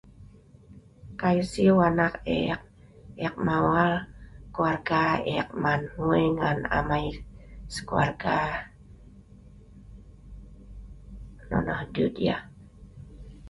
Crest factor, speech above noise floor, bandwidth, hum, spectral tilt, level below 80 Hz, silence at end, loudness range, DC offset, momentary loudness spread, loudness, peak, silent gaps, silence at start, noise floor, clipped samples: 20 dB; 26 dB; 11.5 kHz; none; -7 dB/octave; -46 dBFS; 0 s; 9 LU; under 0.1%; 24 LU; -26 LUFS; -8 dBFS; none; 0.2 s; -51 dBFS; under 0.1%